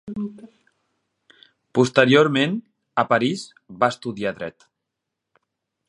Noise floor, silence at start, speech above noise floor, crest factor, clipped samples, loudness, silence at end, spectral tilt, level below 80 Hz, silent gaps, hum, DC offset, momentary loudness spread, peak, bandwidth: -82 dBFS; 0.05 s; 61 dB; 22 dB; under 0.1%; -21 LUFS; 1.4 s; -5.5 dB/octave; -64 dBFS; none; none; under 0.1%; 18 LU; 0 dBFS; 11 kHz